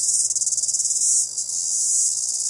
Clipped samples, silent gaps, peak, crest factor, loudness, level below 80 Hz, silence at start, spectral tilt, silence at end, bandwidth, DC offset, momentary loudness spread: under 0.1%; none; -4 dBFS; 18 dB; -18 LUFS; -70 dBFS; 0 s; 3 dB/octave; 0 s; 11.5 kHz; under 0.1%; 4 LU